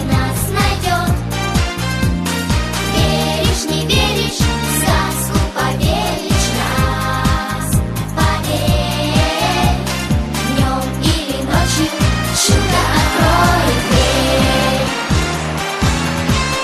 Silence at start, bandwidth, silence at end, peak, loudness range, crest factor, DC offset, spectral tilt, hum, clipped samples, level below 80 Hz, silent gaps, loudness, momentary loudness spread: 0 s; 14 kHz; 0 s; 0 dBFS; 3 LU; 14 dB; under 0.1%; -4.5 dB/octave; none; under 0.1%; -24 dBFS; none; -15 LUFS; 5 LU